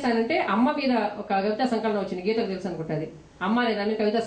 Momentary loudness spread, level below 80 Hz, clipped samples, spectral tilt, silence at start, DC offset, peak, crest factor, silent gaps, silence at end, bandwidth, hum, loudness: 9 LU; -60 dBFS; under 0.1%; -6.5 dB/octave; 0 s; under 0.1%; -12 dBFS; 14 dB; none; 0 s; 9.2 kHz; none; -26 LUFS